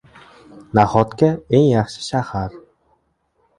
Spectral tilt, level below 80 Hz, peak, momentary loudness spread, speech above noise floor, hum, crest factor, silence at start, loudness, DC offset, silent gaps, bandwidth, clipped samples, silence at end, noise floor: -7 dB/octave; -46 dBFS; 0 dBFS; 11 LU; 49 dB; none; 20 dB; 0.75 s; -18 LUFS; under 0.1%; none; 11.5 kHz; under 0.1%; 1 s; -65 dBFS